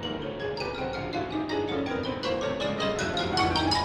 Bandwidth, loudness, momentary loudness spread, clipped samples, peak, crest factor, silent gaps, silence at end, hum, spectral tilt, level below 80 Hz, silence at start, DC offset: 13 kHz; -29 LUFS; 7 LU; under 0.1%; -12 dBFS; 18 dB; none; 0 s; none; -4.5 dB/octave; -48 dBFS; 0 s; under 0.1%